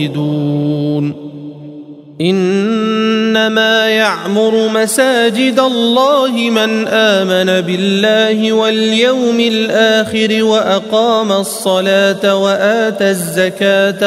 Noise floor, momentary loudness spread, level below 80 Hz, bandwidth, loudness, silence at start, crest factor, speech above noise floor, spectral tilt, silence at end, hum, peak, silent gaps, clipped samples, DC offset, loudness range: -32 dBFS; 5 LU; -60 dBFS; 16 kHz; -12 LUFS; 0 s; 12 dB; 20 dB; -4.5 dB/octave; 0 s; none; 0 dBFS; none; under 0.1%; under 0.1%; 2 LU